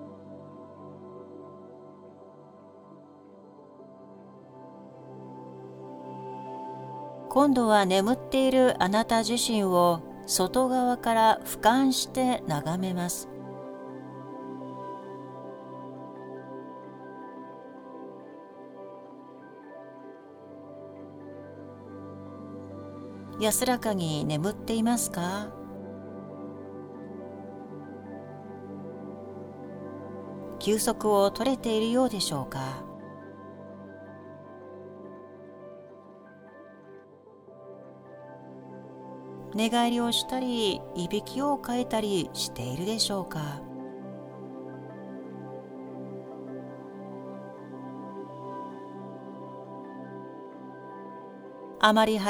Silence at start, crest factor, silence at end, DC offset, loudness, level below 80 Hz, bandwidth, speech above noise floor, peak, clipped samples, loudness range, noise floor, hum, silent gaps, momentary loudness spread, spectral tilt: 0 s; 24 dB; 0 s; under 0.1%; -28 LUFS; -60 dBFS; over 20 kHz; 27 dB; -6 dBFS; under 0.1%; 23 LU; -53 dBFS; none; none; 23 LU; -4 dB/octave